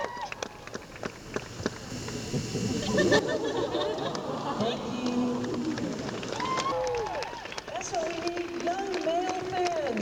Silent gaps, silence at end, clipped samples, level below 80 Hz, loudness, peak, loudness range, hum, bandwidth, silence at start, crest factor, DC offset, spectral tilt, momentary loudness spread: none; 0 s; under 0.1%; -54 dBFS; -31 LUFS; -8 dBFS; 3 LU; none; 19.5 kHz; 0 s; 22 dB; under 0.1%; -4.5 dB/octave; 10 LU